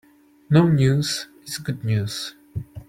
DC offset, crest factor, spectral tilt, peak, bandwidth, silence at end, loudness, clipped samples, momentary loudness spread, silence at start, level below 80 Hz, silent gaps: under 0.1%; 18 dB; -6 dB/octave; -4 dBFS; 16 kHz; 0.05 s; -22 LUFS; under 0.1%; 15 LU; 0.5 s; -50 dBFS; none